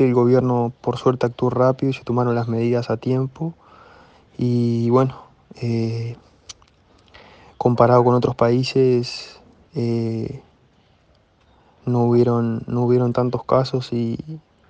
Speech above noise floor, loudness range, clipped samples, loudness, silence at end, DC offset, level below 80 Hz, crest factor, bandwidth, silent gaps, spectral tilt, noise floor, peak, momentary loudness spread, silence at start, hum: 39 dB; 4 LU; under 0.1%; -20 LUFS; 0.3 s; under 0.1%; -56 dBFS; 20 dB; 8.2 kHz; none; -8 dB/octave; -57 dBFS; -2 dBFS; 14 LU; 0 s; none